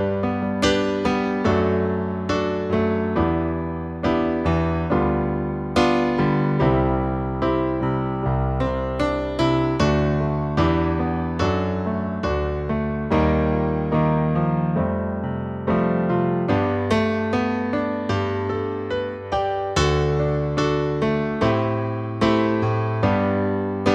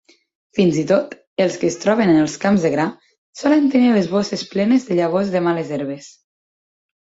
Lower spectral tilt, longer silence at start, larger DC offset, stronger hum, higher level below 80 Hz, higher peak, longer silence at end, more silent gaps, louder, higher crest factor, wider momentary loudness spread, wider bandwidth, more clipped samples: about the same, -7 dB/octave vs -6 dB/octave; second, 0 s vs 0.55 s; neither; neither; first, -36 dBFS vs -58 dBFS; about the same, -4 dBFS vs -2 dBFS; second, 0 s vs 1.05 s; second, none vs 1.27-1.36 s, 3.18-3.33 s; second, -22 LUFS vs -18 LUFS; about the same, 16 dB vs 16 dB; second, 5 LU vs 10 LU; first, 10 kHz vs 8 kHz; neither